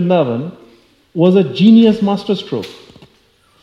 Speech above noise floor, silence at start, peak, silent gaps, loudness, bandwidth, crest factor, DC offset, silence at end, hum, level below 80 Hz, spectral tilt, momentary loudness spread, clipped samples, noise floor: 41 dB; 0 s; 0 dBFS; none; -13 LUFS; 7 kHz; 14 dB; under 0.1%; 0.9 s; none; -58 dBFS; -8.5 dB/octave; 18 LU; under 0.1%; -53 dBFS